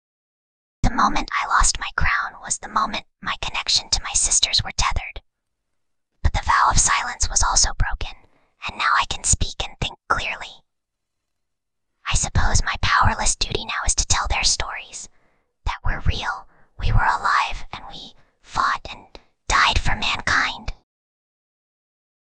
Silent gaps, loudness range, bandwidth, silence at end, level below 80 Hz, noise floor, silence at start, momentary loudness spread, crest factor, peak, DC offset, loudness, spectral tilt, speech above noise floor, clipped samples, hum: none; 4 LU; 10 kHz; 1.65 s; -28 dBFS; -81 dBFS; 0.85 s; 16 LU; 20 dB; -2 dBFS; under 0.1%; -21 LUFS; -1.5 dB/octave; 60 dB; under 0.1%; none